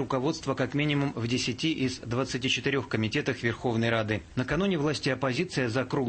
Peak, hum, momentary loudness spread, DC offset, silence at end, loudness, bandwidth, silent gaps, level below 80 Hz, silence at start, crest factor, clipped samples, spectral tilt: -12 dBFS; none; 3 LU; under 0.1%; 0 s; -28 LUFS; 8.8 kHz; none; -54 dBFS; 0 s; 16 dB; under 0.1%; -5 dB/octave